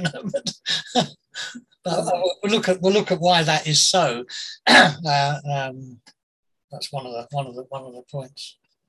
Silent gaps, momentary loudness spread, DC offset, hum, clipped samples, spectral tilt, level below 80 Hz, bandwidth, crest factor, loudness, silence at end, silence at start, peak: 6.23-6.43 s, 6.64-6.68 s; 20 LU; under 0.1%; none; under 0.1%; -3 dB/octave; -64 dBFS; 12.5 kHz; 20 dB; -20 LUFS; 0.4 s; 0 s; -2 dBFS